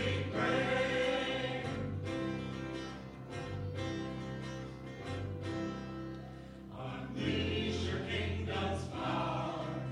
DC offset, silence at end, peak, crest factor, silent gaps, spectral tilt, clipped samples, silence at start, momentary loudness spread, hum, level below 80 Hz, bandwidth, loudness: under 0.1%; 0 s; -20 dBFS; 16 dB; none; -6 dB/octave; under 0.1%; 0 s; 13 LU; none; -54 dBFS; 11 kHz; -37 LUFS